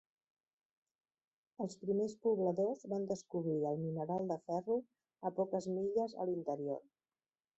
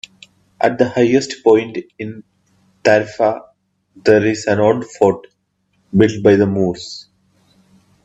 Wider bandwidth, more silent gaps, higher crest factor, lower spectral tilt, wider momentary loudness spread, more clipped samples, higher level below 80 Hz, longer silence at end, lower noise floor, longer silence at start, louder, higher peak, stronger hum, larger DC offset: about the same, 8 kHz vs 8.4 kHz; neither; about the same, 16 dB vs 16 dB; first, -9 dB/octave vs -6 dB/octave; second, 7 LU vs 17 LU; neither; second, -80 dBFS vs -56 dBFS; second, 0.75 s vs 1.05 s; first, under -90 dBFS vs -64 dBFS; first, 1.6 s vs 0.6 s; second, -39 LUFS vs -15 LUFS; second, -24 dBFS vs 0 dBFS; neither; neither